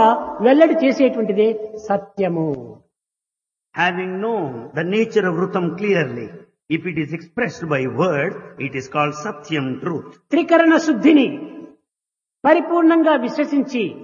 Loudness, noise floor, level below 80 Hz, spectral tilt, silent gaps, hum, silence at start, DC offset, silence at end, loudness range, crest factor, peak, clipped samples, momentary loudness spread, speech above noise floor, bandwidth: -18 LUFS; -87 dBFS; -64 dBFS; -6.5 dB/octave; none; none; 0 s; under 0.1%; 0 s; 6 LU; 18 dB; 0 dBFS; under 0.1%; 13 LU; 69 dB; 7.2 kHz